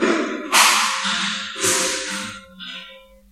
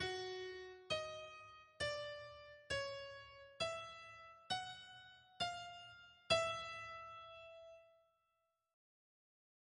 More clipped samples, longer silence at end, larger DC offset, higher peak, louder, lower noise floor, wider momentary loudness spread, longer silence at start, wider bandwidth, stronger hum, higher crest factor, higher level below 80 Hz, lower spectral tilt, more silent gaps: neither; second, 0.3 s vs 1.75 s; neither; first, 0 dBFS vs -22 dBFS; first, -18 LUFS vs -45 LUFS; second, -44 dBFS vs -86 dBFS; first, 20 LU vs 16 LU; about the same, 0 s vs 0 s; first, 16 kHz vs 10.5 kHz; neither; about the same, 22 dB vs 26 dB; first, -58 dBFS vs -72 dBFS; second, -0.5 dB/octave vs -2.5 dB/octave; neither